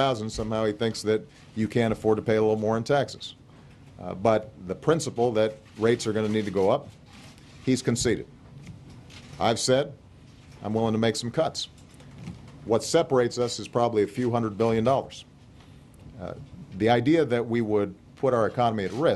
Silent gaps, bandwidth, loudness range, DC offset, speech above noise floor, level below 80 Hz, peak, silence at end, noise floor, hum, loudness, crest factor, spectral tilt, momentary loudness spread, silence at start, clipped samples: none; 12.5 kHz; 3 LU; under 0.1%; 25 dB; -54 dBFS; -8 dBFS; 0 s; -50 dBFS; none; -26 LUFS; 20 dB; -5.5 dB/octave; 19 LU; 0 s; under 0.1%